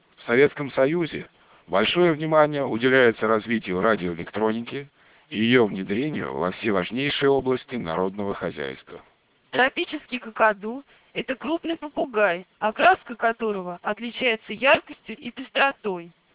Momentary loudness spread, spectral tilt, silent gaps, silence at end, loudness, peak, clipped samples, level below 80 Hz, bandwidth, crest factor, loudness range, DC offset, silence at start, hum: 13 LU; -9 dB/octave; none; 0.25 s; -23 LUFS; -4 dBFS; under 0.1%; -58 dBFS; 4 kHz; 20 dB; 5 LU; under 0.1%; 0.2 s; none